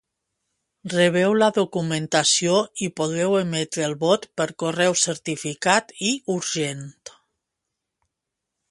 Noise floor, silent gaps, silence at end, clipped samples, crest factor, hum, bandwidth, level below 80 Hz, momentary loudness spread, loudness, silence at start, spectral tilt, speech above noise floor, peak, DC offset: -83 dBFS; none; 1.6 s; under 0.1%; 20 dB; none; 11.5 kHz; -68 dBFS; 10 LU; -22 LUFS; 0.85 s; -3.5 dB/octave; 61 dB; -2 dBFS; under 0.1%